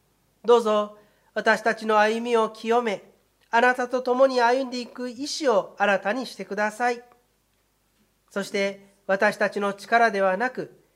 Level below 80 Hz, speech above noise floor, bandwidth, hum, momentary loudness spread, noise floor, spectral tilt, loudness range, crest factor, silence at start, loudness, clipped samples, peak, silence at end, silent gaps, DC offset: -74 dBFS; 45 dB; 15 kHz; none; 12 LU; -68 dBFS; -4 dB/octave; 5 LU; 20 dB; 0.45 s; -23 LUFS; under 0.1%; -6 dBFS; 0.3 s; none; under 0.1%